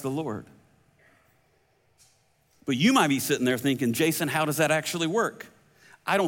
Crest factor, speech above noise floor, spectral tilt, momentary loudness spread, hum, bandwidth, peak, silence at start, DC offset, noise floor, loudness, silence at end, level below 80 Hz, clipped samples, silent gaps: 20 dB; 41 dB; -4.5 dB/octave; 16 LU; none; 17 kHz; -8 dBFS; 0 s; under 0.1%; -66 dBFS; -25 LUFS; 0 s; -68 dBFS; under 0.1%; none